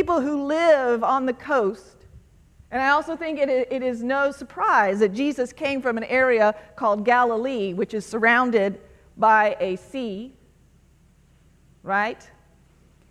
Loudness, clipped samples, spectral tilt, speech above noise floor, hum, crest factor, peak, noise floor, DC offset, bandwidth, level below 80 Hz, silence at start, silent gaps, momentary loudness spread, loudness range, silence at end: -22 LUFS; under 0.1%; -5 dB/octave; 35 dB; none; 18 dB; -6 dBFS; -56 dBFS; under 0.1%; 12 kHz; -56 dBFS; 0 s; none; 11 LU; 5 LU; 0.95 s